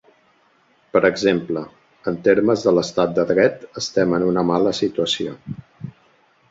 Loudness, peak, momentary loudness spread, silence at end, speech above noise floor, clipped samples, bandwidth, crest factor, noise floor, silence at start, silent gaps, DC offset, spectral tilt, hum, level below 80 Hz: -19 LUFS; -2 dBFS; 18 LU; 0.6 s; 40 dB; under 0.1%; 7.8 kHz; 18 dB; -59 dBFS; 0.95 s; none; under 0.1%; -5.5 dB/octave; none; -56 dBFS